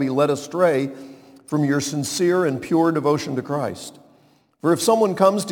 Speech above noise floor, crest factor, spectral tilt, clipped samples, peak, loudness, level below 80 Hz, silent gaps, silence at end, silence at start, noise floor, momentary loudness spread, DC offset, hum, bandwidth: 37 dB; 20 dB; -5.5 dB/octave; under 0.1%; -2 dBFS; -21 LUFS; -66 dBFS; none; 0 s; 0 s; -57 dBFS; 10 LU; under 0.1%; none; 19 kHz